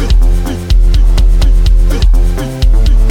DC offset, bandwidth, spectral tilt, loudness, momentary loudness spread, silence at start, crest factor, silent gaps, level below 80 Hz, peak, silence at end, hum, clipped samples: under 0.1%; 9.6 kHz; -6 dB/octave; -12 LUFS; 4 LU; 0 s; 6 dB; none; -6 dBFS; 0 dBFS; 0 s; none; under 0.1%